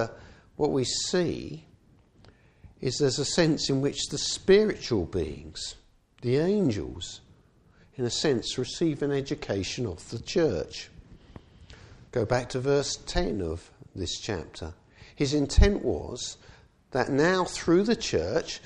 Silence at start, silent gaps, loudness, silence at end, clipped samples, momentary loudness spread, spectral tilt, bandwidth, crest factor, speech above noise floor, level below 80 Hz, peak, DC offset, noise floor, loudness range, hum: 0 s; none; -28 LUFS; 0.05 s; under 0.1%; 14 LU; -5 dB/octave; 11.5 kHz; 22 dB; 33 dB; -38 dBFS; -6 dBFS; under 0.1%; -59 dBFS; 5 LU; none